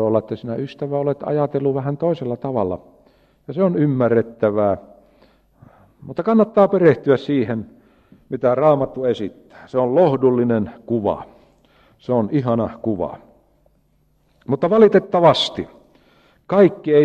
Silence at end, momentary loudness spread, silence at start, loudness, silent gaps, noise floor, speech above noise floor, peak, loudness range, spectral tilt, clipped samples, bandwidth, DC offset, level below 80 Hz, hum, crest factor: 0 s; 13 LU; 0 s; -18 LUFS; none; -61 dBFS; 43 dB; -2 dBFS; 5 LU; -8 dB/octave; under 0.1%; 8.6 kHz; under 0.1%; -56 dBFS; none; 16 dB